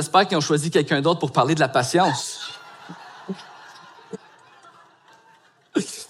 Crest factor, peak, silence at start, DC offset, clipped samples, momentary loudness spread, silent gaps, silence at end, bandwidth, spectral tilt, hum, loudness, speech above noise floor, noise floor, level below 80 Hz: 20 dB; -4 dBFS; 0 s; under 0.1%; under 0.1%; 22 LU; none; 0.05 s; 15.5 kHz; -4.5 dB/octave; none; -21 LUFS; 35 dB; -56 dBFS; -70 dBFS